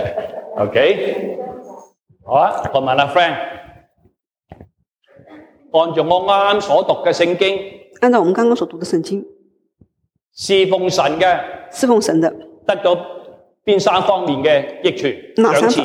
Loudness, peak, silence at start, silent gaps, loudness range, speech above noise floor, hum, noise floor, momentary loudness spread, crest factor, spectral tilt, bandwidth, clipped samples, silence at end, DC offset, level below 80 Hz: -16 LUFS; -2 dBFS; 0 s; none; 4 LU; 54 dB; none; -69 dBFS; 12 LU; 16 dB; -4.5 dB/octave; 14.5 kHz; under 0.1%; 0 s; under 0.1%; -56 dBFS